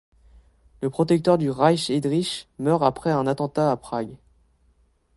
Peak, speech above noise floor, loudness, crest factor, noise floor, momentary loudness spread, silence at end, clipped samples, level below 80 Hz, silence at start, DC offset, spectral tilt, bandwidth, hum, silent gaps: -4 dBFS; 40 dB; -23 LUFS; 20 dB; -62 dBFS; 11 LU; 1 s; under 0.1%; -56 dBFS; 0.8 s; under 0.1%; -6.5 dB/octave; 11.5 kHz; none; none